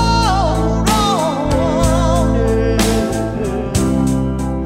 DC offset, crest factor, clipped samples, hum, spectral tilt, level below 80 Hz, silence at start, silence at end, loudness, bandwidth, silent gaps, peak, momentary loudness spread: under 0.1%; 12 dB; under 0.1%; none; -5.5 dB/octave; -22 dBFS; 0 s; 0 s; -16 LUFS; 16 kHz; none; -2 dBFS; 5 LU